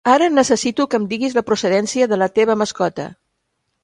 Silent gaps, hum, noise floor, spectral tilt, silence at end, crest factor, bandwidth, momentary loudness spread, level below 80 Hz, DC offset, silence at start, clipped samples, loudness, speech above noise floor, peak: none; none; -72 dBFS; -4 dB/octave; 0.7 s; 16 dB; 11.5 kHz; 8 LU; -58 dBFS; under 0.1%; 0.05 s; under 0.1%; -17 LUFS; 55 dB; 0 dBFS